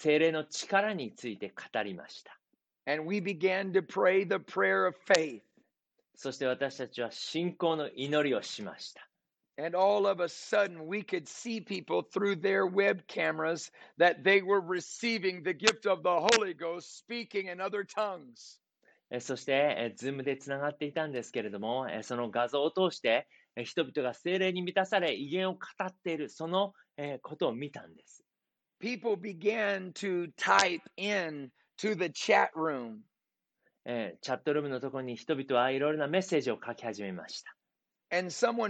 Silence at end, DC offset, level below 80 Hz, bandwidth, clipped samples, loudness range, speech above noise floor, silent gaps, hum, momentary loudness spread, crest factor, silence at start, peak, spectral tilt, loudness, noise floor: 0 s; under 0.1%; -80 dBFS; 9 kHz; under 0.1%; 6 LU; 57 dB; none; none; 14 LU; 26 dB; 0 s; -6 dBFS; -4 dB/octave; -32 LUFS; -89 dBFS